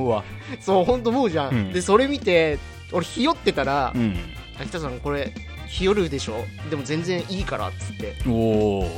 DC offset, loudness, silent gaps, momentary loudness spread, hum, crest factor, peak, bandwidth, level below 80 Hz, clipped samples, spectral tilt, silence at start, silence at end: under 0.1%; -23 LUFS; none; 12 LU; none; 20 dB; -4 dBFS; 16.5 kHz; -38 dBFS; under 0.1%; -5.5 dB/octave; 0 s; 0 s